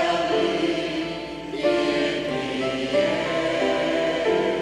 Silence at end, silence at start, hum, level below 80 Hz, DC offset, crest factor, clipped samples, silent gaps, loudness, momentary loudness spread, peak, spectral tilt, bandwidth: 0 s; 0 s; none; -52 dBFS; under 0.1%; 14 dB; under 0.1%; none; -23 LUFS; 5 LU; -8 dBFS; -4.5 dB/octave; 11.5 kHz